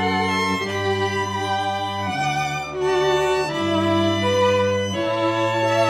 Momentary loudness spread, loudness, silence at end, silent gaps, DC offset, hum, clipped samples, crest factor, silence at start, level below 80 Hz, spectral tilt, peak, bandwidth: 5 LU; -21 LUFS; 0 s; none; under 0.1%; none; under 0.1%; 14 dB; 0 s; -54 dBFS; -5 dB/octave; -8 dBFS; 16 kHz